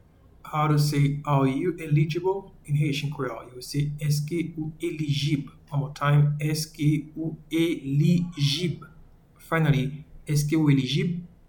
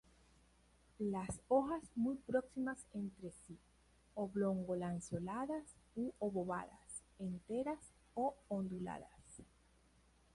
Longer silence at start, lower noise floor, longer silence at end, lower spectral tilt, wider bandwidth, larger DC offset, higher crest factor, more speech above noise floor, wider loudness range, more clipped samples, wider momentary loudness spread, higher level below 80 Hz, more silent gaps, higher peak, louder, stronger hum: second, 0.45 s vs 1 s; second, -52 dBFS vs -71 dBFS; second, 0.2 s vs 0.9 s; about the same, -6.5 dB/octave vs -7 dB/octave; first, 19 kHz vs 11.5 kHz; neither; about the same, 16 dB vs 20 dB; about the same, 27 dB vs 30 dB; about the same, 3 LU vs 4 LU; neither; second, 10 LU vs 15 LU; first, -52 dBFS vs -68 dBFS; neither; first, -10 dBFS vs -22 dBFS; first, -26 LUFS vs -43 LUFS; neither